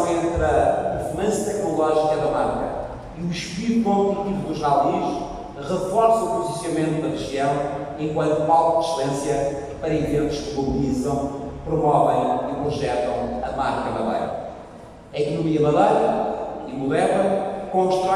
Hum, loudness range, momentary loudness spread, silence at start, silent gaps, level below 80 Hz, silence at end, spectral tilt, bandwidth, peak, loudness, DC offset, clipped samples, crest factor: none; 2 LU; 10 LU; 0 s; none; -42 dBFS; 0 s; -6 dB/octave; 14 kHz; -4 dBFS; -22 LUFS; under 0.1%; under 0.1%; 16 dB